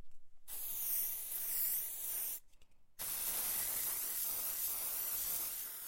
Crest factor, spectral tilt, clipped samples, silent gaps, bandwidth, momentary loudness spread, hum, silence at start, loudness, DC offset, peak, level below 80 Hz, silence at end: 16 dB; 1 dB/octave; under 0.1%; none; 17 kHz; 6 LU; none; 0 s; -37 LUFS; under 0.1%; -24 dBFS; -66 dBFS; 0 s